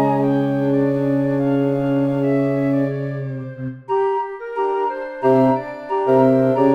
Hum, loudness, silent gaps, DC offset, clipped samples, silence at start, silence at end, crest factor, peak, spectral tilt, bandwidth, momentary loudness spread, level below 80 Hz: none; -19 LUFS; none; under 0.1%; under 0.1%; 0 s; 0 s; 16 dB; -2 dBFS; -9.5 dB/octave; 5.2 kHz; 10 LU; -54 dBFS